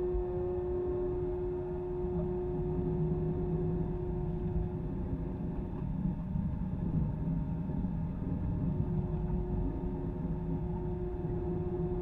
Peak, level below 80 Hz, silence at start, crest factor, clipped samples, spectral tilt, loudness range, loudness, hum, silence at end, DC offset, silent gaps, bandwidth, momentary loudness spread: -20 dBFS; -40 dBFS; 0 s; 14 dB; under 0.1%; -12 dB/octave; 1 LU; -35 LUFS; none; 0 s; under 0.1%; none; 3.8 kHz; 4 LU